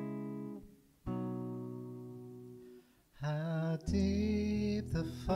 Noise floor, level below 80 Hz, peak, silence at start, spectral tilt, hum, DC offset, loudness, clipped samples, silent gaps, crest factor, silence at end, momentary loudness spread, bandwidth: -60 dBFS; -50 dBFS; -22 dBFS; 0 s; -7.5 dB/octave; none; under 0.1%; -38 LUFS; under 0.1%; none; 16 dB; 0 s; 18 LU; 13 kHz